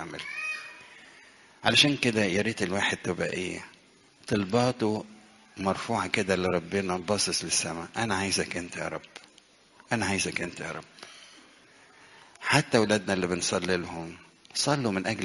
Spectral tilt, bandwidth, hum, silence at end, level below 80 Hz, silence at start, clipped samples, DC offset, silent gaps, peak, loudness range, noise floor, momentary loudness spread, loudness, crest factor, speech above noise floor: -3.5 dB/octave; 11.5 kHz; none; 0 s; -62 dBFS; 0 s; under 0.1%; under 0.1%; none; -4 dBFS; 5 LU; -59 dBFS; 20 LU; -28 LUFS; 26 dB; 30 dB